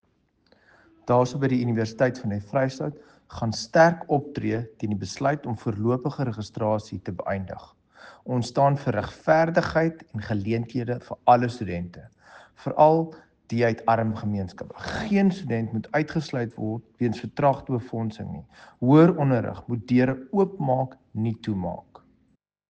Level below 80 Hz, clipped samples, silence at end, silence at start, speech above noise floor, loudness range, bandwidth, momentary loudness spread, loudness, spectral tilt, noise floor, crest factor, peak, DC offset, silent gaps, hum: -56 dBFS; under 0.1%; 0.9 s; 1.05 s; 43 dB; 5 LU; 9 kHz; 13 LU; -25 LUFS; -7.5 dB/octave; -68 dBFS; 20 dB; -4 dBFS; under 0.1%; none; none